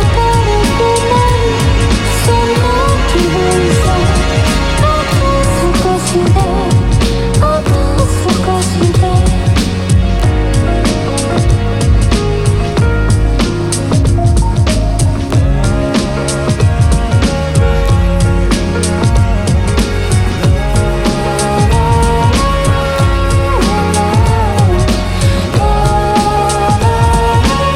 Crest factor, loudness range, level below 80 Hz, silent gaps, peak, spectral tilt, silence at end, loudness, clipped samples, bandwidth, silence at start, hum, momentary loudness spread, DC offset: 10 dB; 1 LU; -16 dBFS; none; 0 dBFS; -5.5 dB/octave; 0 s; -12 LUFS; under 0.1%; 14.5 kHz; 0 s; none; 3 LU; under 0.1%